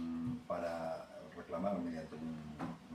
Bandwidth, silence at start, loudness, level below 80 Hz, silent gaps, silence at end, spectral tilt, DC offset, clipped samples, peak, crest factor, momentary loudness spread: 13.5 kHz; 0 s; -43 LUFS; -70 dBFS; none; 0 s; -7.5 dB/octave; under 0.1%; under 0.1%; -24 dBFS; 18 dB; 8 LU